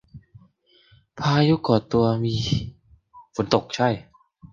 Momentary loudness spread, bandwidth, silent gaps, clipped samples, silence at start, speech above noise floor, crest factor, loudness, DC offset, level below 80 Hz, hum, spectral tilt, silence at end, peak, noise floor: 11 LU; 7.6 kHz; none; under 0.1%; 0.15 s; 37 dB; 22 dB; -23 LUFS; under 0.1%; -48 dBFS; none; -6.5 dB/octave; 0.05 s; -2 dBFS; -58 dBFS